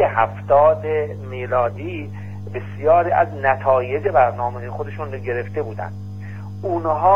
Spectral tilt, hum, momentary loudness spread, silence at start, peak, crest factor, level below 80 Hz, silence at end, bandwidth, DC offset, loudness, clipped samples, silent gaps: -8.5 dB/octave; 50 Hz at -30 dBFS; 15 LU; 0 s; -2 dBFS; 18 dB; -52 dBFS; 0 s; 6.8 kHz; 0.8%; -20 LUFS; under 0.1%; none